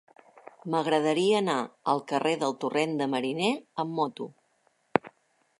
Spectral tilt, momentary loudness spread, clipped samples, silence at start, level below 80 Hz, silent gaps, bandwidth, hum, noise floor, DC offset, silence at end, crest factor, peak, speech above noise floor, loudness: -5 dB/octave; 8 LU; under 0.1%; 0.65 s; -76 dBFS; none; 11.5 kHz; none; -70 dBFS; under 0.1%; 0.5 s; 26 dB; -2 dBFS; 42 dB; -28 LUFS